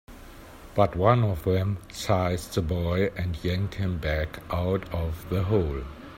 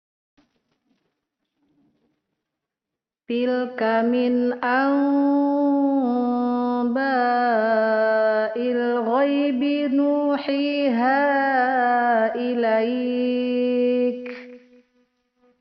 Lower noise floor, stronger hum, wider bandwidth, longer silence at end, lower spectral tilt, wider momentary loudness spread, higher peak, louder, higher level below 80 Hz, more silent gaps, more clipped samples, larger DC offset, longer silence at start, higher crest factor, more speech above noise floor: second, -45 dBFS vs -87 dBFS; neither; first, 16 kHz vs 5.8 kHz; second, 0 s vs 1.05 s; first, -7 dB/octave vs -2.5 dB/octave; first, 10 LU vs 4 LU; about the same, -6 dBFS vs -8 dBFS; second, -27 LUFS vs -21 LUFS; first, -42 dBFS vs -70 dBFS; neither; neither; neither; second, 0.1 s vs 3.3 s; first, 20 dB vs 14 dB; second, 19 dB vs 67 dB